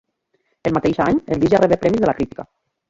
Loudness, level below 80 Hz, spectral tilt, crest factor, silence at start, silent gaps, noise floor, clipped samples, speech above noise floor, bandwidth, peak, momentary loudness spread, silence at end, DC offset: -18 LUFS; -44 dBFS; -7.5 dB/octave; 16 dB; 0.65 s; none; -68 dBFS; under 0.1%; 51 dB; 7.8 kHz; -2 dBFS; 11 LU; 0.5 s; under 0.1%